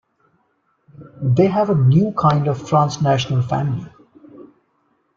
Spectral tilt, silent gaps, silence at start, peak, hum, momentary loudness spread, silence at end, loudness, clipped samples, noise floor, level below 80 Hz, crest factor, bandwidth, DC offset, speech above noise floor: -7.5 dB/octave; none; 1 s; -2 dBFS; none; 8 LU; 0.75 s; -17 LUFS; under 0.1%; -65 dBFS; -54 dBFS; 16 dB; 7.4 kHz; under 0.1%; 49 dB